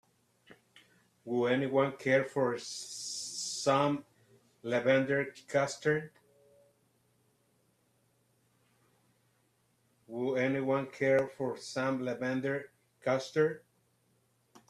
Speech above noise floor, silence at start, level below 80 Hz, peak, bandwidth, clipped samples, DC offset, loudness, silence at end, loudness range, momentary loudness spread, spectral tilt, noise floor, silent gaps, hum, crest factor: 42 dB; 0.5 s; -76 dBFS; -14 dBFS; 13.5 kHz; under 0.1%; under 0.1%; -32 LUFS; 1.1 s; 6 LU; 10 LU; -4.5 dB/octave; -73 dBFS; none; none; 20 dB